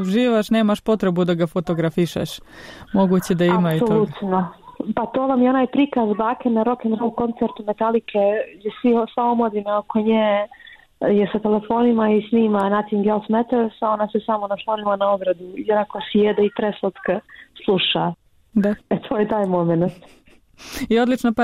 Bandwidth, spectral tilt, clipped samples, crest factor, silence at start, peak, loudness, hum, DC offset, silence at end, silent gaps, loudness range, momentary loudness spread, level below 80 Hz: 15 kHz; -7 dB/octave; under 0.1%; 12 dB; 0 s; -8 dBFS; -20 LUFS; none; under 0.1%; 0 s; none; 2 LU; 7 LU; -54 dBFS